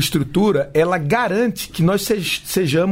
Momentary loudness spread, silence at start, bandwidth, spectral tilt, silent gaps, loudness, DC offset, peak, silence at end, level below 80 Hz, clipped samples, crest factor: 3 LU; 0 s; 16.5 kHz; -5 dB/octave; none; -18 LUFS; under 0.1%; -4 dBFS; 0 s; -44 dBFS; under 0.1%; 12 dB